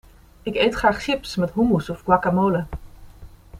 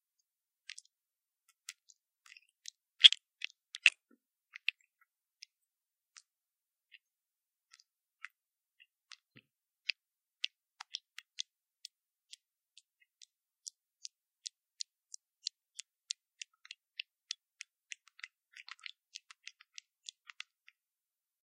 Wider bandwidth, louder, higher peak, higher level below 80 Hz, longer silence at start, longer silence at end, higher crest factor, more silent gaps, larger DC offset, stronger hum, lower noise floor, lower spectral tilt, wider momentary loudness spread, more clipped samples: about the same, 15.5 kHz vs 15.5 kHz; first, -21 LUFS vs -32 LUFS; about the same, -2 dBFS vs 0 dBFS; first, -42 dBFS vs under -90 dBFS; second, 0.45 s vs 1.7 s; second, 0 s vs 17.55 s; second, 20 dB vs 40 dB; neither; neither; neither; second, -43 dBFS vs under -90 dBFS; first, -6.5 dB/octave vs 5 dB/octave; second, 12 LU vs 26 LU; neither